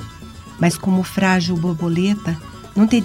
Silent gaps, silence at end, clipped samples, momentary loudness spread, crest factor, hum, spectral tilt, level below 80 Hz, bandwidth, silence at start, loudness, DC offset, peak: none; 0 s; under 0.1%; 15 LU; 16 dB; none; -6 dB/octave; -46 dBFS; 16 kHz; 0 s; -19 LUFS; 0.1%; -4 dBFS